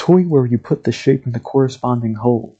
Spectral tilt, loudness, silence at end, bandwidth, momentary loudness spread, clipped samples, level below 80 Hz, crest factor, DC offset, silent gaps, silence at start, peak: -8.5 dB/octave; -17 LUFS; 0.1 s; 8 kHz; 7 LU; under 0.1%; -54 dBFS; 16 dB; under 0.1%; none; 0 s; 0 dBFS